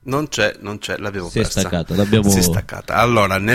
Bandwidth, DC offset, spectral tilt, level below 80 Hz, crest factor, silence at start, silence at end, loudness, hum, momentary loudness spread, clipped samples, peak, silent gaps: 16.5 kHz; under 0.1%; -4.5 dB/octave; -36 dBFS; 16 dB; 0.05 s; 0 s; -18 LUFS; none; 10 LU; under 0.1%; -2 dBFS; none